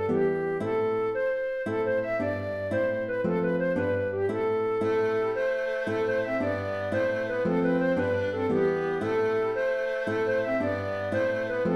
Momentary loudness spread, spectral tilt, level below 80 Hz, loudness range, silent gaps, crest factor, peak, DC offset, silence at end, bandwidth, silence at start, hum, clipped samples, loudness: 3 LU; -7.5 dB/octave; -60 dBFS; 1 LU; none; 14 dB; -14 dBFS; under 0.1%; 0 s; 9.8 kHz; 0 s; none; under 0.1%; -27 LUFS